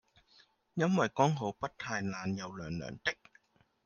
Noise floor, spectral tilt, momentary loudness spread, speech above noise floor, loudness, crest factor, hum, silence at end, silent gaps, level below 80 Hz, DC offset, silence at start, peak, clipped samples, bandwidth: -68 dBFS; -5.5 dB/octave; 11 LU; 34 dB; -34 LUFS; 22 dB; none; 0.7 s; none; -68 dBFS; under 0.1%; 0.75 s; -14 dBFS; under 0.1%; 7.2 kHz